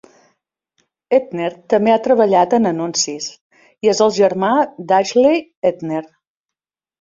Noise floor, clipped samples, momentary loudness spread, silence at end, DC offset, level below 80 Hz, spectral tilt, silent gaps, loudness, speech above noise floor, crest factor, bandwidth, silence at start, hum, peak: -88 dBFS; under 0.1%; 11 LU; 0.95 s; under 0.1%; -60 dBFS; -4 dB/octave; 3.41-3.50 s, 5.57-5.62 s; -16 LUFS; 73 dB; 16 dB; 7.8 kHz; 1.1 s; none; -2 dBFS